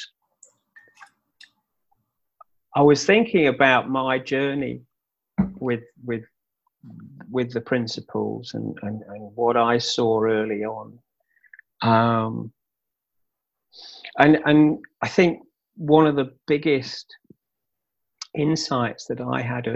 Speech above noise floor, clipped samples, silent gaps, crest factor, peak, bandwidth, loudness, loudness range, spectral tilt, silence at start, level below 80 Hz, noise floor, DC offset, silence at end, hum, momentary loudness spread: 63 dB; under 0.1%; none; 22 dB; -2 dBFS; 8.2 kHz; -22 LUFS; 9 LU; -6 dB/octave; 0 s; -58 dBFS; -84 dBFS; under 0.1%; 0 s; none; 17 LU